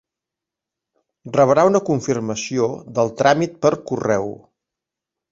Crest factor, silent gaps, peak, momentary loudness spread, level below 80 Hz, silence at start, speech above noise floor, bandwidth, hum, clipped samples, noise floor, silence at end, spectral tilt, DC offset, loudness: 20 dB; none; -2 dBFS; 9 LU; -58 dBFS; 1.25 s; 68 dB; 8 kHz; none; under 0.1%; -86 dBFS; 0.95 s; -5.5 dB/octave; under 0.1%; -19 LUFS